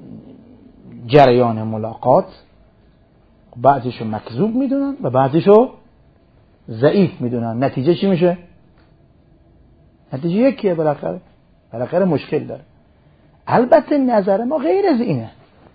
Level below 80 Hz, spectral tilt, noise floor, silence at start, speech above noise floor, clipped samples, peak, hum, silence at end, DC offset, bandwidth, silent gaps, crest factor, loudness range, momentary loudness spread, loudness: -52 dBFS; -10 dB/octave; -52 dBFS; 0 s; 36 dB; under 0.1%; 0 dBFS; none; 0.45 s; under 0.1%; 6 kHz; none; 18 dB; 4 LU; 17 LU; -16 LUFS